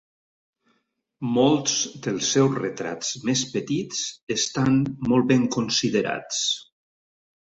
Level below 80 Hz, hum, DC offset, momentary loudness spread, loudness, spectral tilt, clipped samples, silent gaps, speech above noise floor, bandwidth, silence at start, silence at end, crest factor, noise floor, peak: -60 dBFS; none; under 0.1%; 9 LU; -23 LUFS; -4 dB/octave; under 0.1%; 4.22-4.27 s; 49 dB; 8.2 kHz; 1.2 s; 0.8 s; 18 dB; -72 dBFS; -6 dBFS